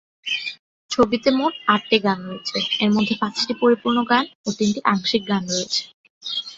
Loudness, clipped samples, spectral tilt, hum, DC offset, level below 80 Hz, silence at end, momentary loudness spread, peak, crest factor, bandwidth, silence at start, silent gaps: -21 LUFS; under 0.1%; -4 dB/octave; none; under 0.1%; -58 dBFS; 0 s; 9 LU; -2 dBFS; 20 dB; 8 kHz; 0.25 s; 0.59-0.89 s, 4.35-4.44 s, 5.94-6.04 s, 6.10-6.21 s